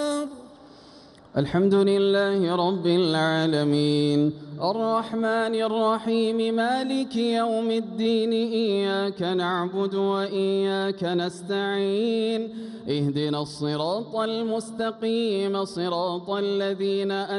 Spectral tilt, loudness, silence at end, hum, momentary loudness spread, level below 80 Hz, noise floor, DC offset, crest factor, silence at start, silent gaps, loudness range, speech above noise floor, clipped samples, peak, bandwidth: -6 dB/octave; -25 LUFS; 0 s; none; 6 LU; -64 dBFS; -49 dBFS; under 0.1%; 14 dB; 0 s; none; 4 LU; 25 dB; under 0.1%; -10 dBFS; 11.5 kHz